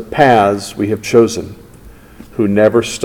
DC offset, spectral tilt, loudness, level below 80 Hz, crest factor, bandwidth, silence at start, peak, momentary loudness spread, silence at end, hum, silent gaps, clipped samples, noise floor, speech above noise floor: under 0.1%; -5.5 dB/octave; -13 LUFS; -44 dBFS; 14 dB; 18.5 kHz; 0 s; 0 dBFS; 15 LU; 0 s; none; none; 0.5%; -38 dBFS; 26 dB